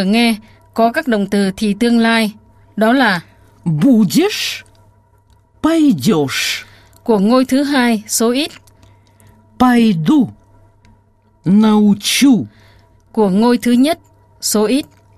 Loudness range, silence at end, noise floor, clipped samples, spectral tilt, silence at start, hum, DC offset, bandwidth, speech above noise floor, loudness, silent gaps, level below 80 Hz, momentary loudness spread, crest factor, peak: 3 LU; 0.35 s; -53 dBFS; under 0.1%; -4.5 dB/octave; 0 s; none; under 0.1%; 15 kHz; 40 dB; -14 LUFS; none; -50 dBFS; 11 LU; 14 dB; 0 dBFS